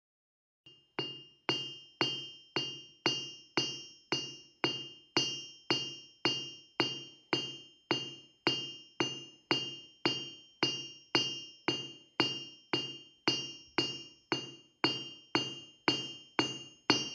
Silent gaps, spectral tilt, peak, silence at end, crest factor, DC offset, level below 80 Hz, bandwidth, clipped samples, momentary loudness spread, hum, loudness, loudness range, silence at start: none; -3 dB/octave; -10 dBFS; 0 s; 28 dB; under 0.1%; -80 dBFS; 10 kHz; under 0.1%; 9 LU; none; -35 LUFS; 2 LU; 0.65 s